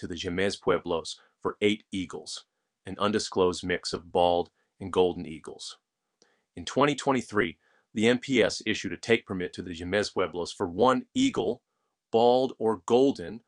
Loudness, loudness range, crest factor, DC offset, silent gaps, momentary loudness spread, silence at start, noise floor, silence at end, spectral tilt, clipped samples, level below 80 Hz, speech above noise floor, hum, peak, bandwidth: -27 LUFS; 3 LU; 22 dB; under 0.1%; none; 16 LU; 0 s; -69 dBFS; 0.1 s; -4.5 dB/octave; under 0.1%; -60 dBFS; 42 dB; none; -6 dBFS; 11 kHz